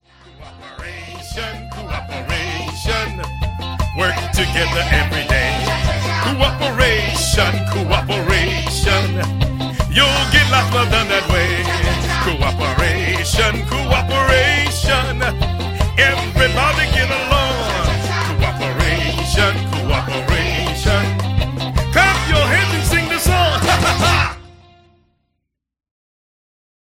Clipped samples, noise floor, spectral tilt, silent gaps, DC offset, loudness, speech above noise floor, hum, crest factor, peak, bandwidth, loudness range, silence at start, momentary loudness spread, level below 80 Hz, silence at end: under 0.1%; -74 dBFS; -4 dB/octave; none; under 0.1%; -16 LUFS; 59 dB; none; 16 dB; 0 dBFS; 16.5 kHz; 5 LU; 0.4 s; 10 LU; -24 dBFS; 2.35 s